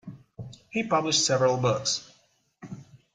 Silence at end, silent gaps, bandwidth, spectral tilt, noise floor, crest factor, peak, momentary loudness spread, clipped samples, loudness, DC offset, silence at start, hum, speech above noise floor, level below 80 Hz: 0.2 s; none; 9.6 kHz; -3.5 dB/octave; -65 dBFS; 18 dB; -10 dBFS; 22 LU; under 0.1%; -25 LUFS; under 0.1%; 0.05 s; none; 40 dB; -64 dBFS